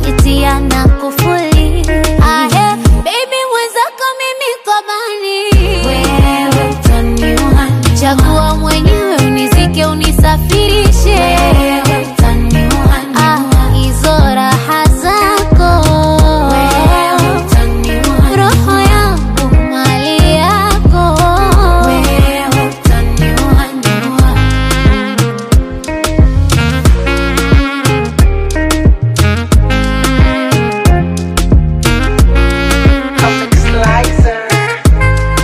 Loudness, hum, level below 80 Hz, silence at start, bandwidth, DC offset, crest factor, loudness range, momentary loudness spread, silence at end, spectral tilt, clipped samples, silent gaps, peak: -10 LUFS; none; -12 dBFS; 0 s; 16 kHz; under 0.1%; 8 dB; 2 LU; 4 LU; 0 s; -5.5 dB/octave; under 0.1%; none; 0 dBFS